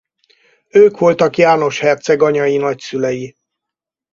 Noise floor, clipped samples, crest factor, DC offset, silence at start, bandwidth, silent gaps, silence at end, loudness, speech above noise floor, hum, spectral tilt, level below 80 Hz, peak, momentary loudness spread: -83 dBFS; under 0.1%; 14 dB; under 0.1%; 0.75 s; 7.4 kHz; none; 0.85 s; -13 LUFS; 71 dB; none; -5.5 dB/octave; -58 dBFS; 0 dBFS; 9 LU